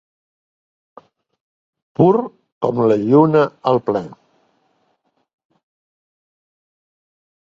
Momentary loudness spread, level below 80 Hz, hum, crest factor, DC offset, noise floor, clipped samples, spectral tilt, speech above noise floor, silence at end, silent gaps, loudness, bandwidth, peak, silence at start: 16 LU; -60 dBFS; none; 20 dB; under 0.1%; -66 dBFS; under 0.1%; -9.5 dB/octave; 52 dB; 3.5 s; 2.52-2.61 s; -16 LUFS; 7.2 kHz; -2 dBFS; 2 s